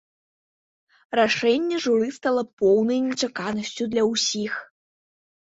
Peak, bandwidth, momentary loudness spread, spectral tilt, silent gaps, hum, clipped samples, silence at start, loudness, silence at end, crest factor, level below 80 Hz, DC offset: -6 dBFS; 8 kHz; 8 LU; -3.5 dB/octave; 2.53-2.57 s; none; under 0.1%; 1.1 s; -23 LUFS; 0.95 s; 18 dB; -66 dBFS; under 0.1%